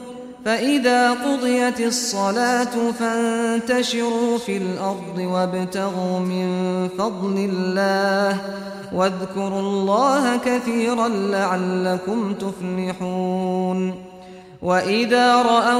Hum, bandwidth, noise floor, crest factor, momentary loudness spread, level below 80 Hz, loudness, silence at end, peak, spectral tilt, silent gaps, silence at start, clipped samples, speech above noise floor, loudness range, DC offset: none; 15 kHz; -41 dBFS; 16 dB; 9 LU; -60 dBFS; -21 LUFS; 0 s; -4 dBFS; -5 dB/octave; none; 0 s; under 0.1%; 21 dB; 4 LU; under 0.1%